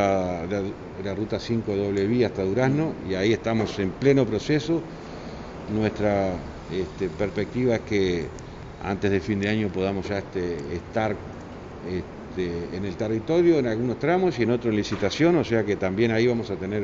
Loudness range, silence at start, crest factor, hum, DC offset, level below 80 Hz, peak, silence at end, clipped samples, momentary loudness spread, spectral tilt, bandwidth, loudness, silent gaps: 5 LU; 0 s; 18 dB; none; under 0.1%; -46 dBFS; -6 dBFS; 0 s; under 0.1%; 13 LU; -7 dB/octave; 7.8 kHz; -25 LUFS; none